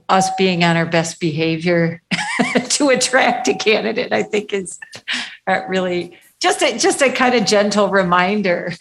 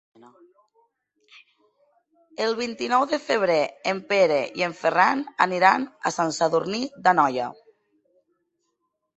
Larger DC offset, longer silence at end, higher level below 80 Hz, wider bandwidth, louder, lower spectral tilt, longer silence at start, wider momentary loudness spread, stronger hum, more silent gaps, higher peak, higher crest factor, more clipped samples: neither; second, 0.05 s vs 1.65 s; first, -58 dBFS vs -72 dBFS; first, 12.5 kHz vs 8.2 kHz; first, -16 LUFS vs -23 LUFS; about the same, -4 dB/octave vs -4 dB/octave; second, 0.1 s vs 2.4 s; about the same, 9 LU vs 9 LU; neither; neither; about the same, 0 dBFS vs -2 dBFS; second, 16 dB vs 24 dB; neither